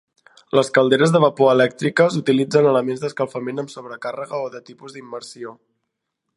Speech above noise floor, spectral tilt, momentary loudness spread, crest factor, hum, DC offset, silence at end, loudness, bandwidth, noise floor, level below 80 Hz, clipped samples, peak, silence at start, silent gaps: 59 dB; -6 dB/octave; 19 LU; 18 dB; none; under 0.1%; 0.85 s; -18 LUFS; 11.5 kHz; -78 dBFS; -68 dBFS; under 0.1%; 0 dBFS; 0.55 s; none